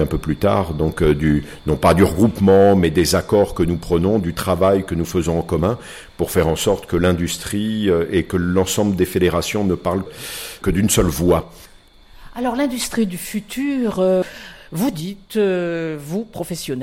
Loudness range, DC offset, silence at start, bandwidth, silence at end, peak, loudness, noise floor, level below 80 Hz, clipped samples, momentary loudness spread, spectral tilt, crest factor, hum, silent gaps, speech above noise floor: 6 LU; under 0.1%; 0 s; 16.5 kHz; 0 s; -4 dBFS; -18 LUFS; -46 dBFS; -36 dBFS; under 0.1%; 11 LU; -5.5 dB/octave; 14 dB; none; none; 28 dB